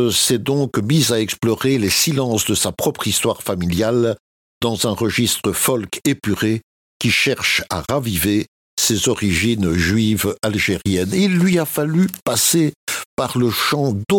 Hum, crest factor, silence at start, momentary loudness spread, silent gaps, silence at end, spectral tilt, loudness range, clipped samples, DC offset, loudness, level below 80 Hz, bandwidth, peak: none; 16 dB; 0 s; 6 LU; 4.20-4.61 s, 6.63-7.00 s, 8.48-8.77 s, 12.22-12.26 s, 12.76-12.87 s, 13.05-13.17 s; 0 s; -4 dB/octave; 2 LU; under 0.1%; under 0.1%; -18 LUFS; -44 dBFS; 17.5 kHz; -4 dBFS